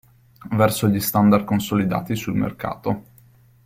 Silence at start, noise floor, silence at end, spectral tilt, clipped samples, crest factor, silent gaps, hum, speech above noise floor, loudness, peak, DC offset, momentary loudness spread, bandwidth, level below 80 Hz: 0.45 s; -52 dBFS; 0.65 s; -6 dB/octave; under 0.1%; 20 dB; none; none; 32 dB; -21 LUFS; -2 dBFS; under 0.1%; 10 LU; 16.5 kHz; -50 dBFS